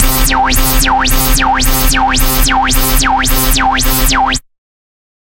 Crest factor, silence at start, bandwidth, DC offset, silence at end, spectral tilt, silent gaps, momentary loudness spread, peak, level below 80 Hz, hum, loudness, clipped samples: 10 dB; 0 s; 17 kHz; under 0.1%; 0.9 s; -2.5 dB/octave; none; 1 LU; 0 dBFS; -14 dBFS; none; -10 LUFS; under 0.1%